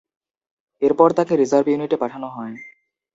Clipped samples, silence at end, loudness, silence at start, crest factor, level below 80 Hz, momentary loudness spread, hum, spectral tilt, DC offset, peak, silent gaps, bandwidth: under 0.1%; 0.45 s; -18 LUFS; 0.8 s; 20 dB; -66 dBFS; 17 LU; none; -6.5 dB/octave; under 0.1%; 0 dBFS; none; 8 kHz